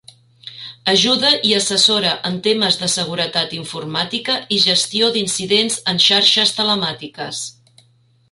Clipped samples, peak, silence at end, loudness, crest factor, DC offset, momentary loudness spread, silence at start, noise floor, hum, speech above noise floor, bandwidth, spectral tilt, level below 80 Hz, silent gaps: under 0.1%; 0 dBFS; 0.8 s; -15 LUFS; 18 dB; under 0.1%; 14 LU; 0.45 s; -56 dBFS; none; 39 dB; 11.5 kHz; -2 dB/octave; -60 dBFS; none